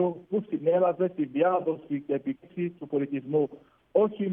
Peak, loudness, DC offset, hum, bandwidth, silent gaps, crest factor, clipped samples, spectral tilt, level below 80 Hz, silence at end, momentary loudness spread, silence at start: -10 dBFS; -28 LUFS; under 0.1%; none; 3.7 kHz; none; 16 dB; under 0.1%; -11 dB/octave; -76 dBFS; 0 s; 9 LU; 0 s